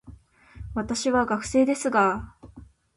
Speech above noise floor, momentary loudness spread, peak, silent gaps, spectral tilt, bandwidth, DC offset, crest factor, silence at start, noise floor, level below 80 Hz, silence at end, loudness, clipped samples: 26 dB; 13 LU; -10 dBFS; none; -4.5 dB/octave; 11.5 kHz; under 0.1%; 16 dB; 0.05 s; -49 dBFS; -48 dBFS; 0.3 s; -24 LUFS; under 0.1%